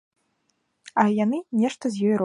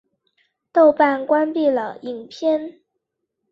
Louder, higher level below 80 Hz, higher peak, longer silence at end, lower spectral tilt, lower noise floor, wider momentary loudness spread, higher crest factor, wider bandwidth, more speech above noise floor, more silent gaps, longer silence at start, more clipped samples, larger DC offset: second, -24 LUFS vs -19 LUFS; about the same, -74 dBFS vs -70 dBFS; second, -8 dBFS vs -2 dBFS; second, 0 s vs 0.8 s; about the same, -6.5 dB/octave vs -5.5 dB/octave; second, -72 dBFS vs -78 dBFS; second, 4 LU vs 17 LU; about the same, 18 dB vs 18 dB; first, 11 kHz vs 7 kHz; second, 50 dB vs 60 dB; neither; about the same, 0.85 s vs 0.75 s; neither; neither